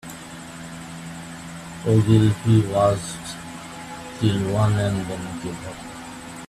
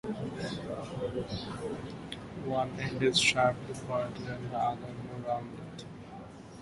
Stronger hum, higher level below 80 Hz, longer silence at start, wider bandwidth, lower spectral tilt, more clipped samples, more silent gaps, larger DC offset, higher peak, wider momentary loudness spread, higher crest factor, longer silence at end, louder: neither; first, -50 dBFS vs -58 dBFS; about the same, 0.05 s vs 0.05 s; first, 13.5 kHz vs 11.5 kHz; first, -6.5 dB/octave vs -4 dB/octave; neither; neither; neither; first, -4 dBFS vs -14 dBFS; about the same, 19 LU vs 19 LU; about the same, 20 dB vs 20 dB; about the same, 0.05 s vs 0 s; first, -21 LUFS vs -33 LUFS